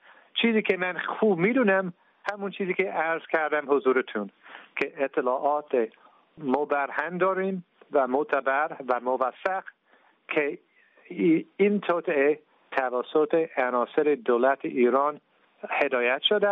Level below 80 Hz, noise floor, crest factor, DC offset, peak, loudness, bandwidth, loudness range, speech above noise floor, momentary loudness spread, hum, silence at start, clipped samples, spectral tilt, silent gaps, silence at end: -78 dBFS; -63 dBFS; 18 dB; under 0.1%; -8 dBFS; -26 LUFS; 6 kHz; 3 LU; 37 dB; 10 LU; none; 0.35 s; under 0.1%; -3 dB/octave; none; 0 s